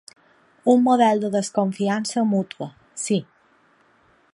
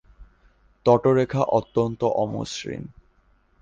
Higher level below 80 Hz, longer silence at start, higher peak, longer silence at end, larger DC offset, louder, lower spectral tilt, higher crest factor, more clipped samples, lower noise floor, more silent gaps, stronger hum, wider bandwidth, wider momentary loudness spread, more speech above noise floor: second, -72 dBFS vs -52 dBFS; first, 0.65 s vs 0.2 s; about the same, -4 dBFS vs -4 dBFS; first, 1.1 s vs 0.75 s; neither; about the same, -21 LUFS vs -23 LUFS; about the same, -5.5 dB/octave vs -6.5 dB/octave; about the same, 18 dB vs 20 dB; neither; about the same, -59 dBFS vs -61 dBFS; neither; neither; first, 11.5 kHz vs 9.6 kHz; about the same, 14 LU vs 15 LU; about the same, 39 dB vs 39 dB